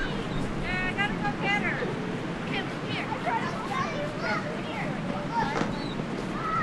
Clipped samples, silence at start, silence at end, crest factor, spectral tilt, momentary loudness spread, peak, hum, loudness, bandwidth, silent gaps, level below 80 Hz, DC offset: under 0.1%; 0 s; 0 s; 18 dB; -5.5 dB/octave; 6 LU; -12 dBFS; none; -30 LUFS; 12.5 kHz; none; -46 dBFS; under 0.1%